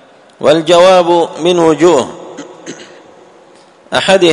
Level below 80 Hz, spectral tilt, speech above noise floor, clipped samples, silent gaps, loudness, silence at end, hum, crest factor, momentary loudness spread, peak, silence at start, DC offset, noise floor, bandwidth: -54 dBFS; -4.5 dB/octave; 34 dB; 0.6%; none; -9 LUFS; 0 s; none; 12 dB; 23 LU; 0 dBFS; 0.4 s; under 0.1%; -42 dBFS; 11 kHz